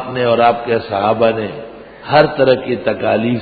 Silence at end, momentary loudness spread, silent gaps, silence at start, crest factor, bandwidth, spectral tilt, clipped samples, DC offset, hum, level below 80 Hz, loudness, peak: 0 s; 13 LU; none; 0 s; 14 dB; 4.9 kHz; -9.5 dB/octave; under 0.1%; under 0.1%; none; -48 dBFS; -14 LUFS; 0 dBFS